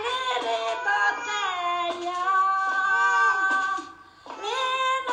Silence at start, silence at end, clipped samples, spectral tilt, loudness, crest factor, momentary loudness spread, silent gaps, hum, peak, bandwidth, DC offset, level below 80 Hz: 0 s; 0 s; under 0.1%; -0.5 dB/octave; -24 LUFS; 14 dB; 9 LU; none; none; -12 dBFS; 11 kHz; under 0.1%; -72 dBFS